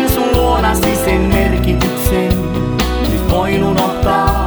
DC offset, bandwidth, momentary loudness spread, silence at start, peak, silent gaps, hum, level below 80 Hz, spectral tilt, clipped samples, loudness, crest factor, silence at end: under 0.1%; over 20 kHz; 3 LU; 0 s; 0 dBFS; none; none; -20 dBFS; -5.5 dB/octave; under 0.1%; -14 LUFS; 12 dB; 0 s